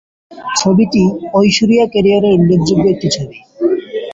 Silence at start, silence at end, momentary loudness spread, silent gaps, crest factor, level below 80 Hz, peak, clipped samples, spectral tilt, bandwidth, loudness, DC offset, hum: 0.3 s; 0 s; 8 LU; none; 12 dB; -44 dBFS; 0 dBFS; under 0.1%; -5.5 dB/octave; 8 kHz; -12 LUFS; under 0.1%; none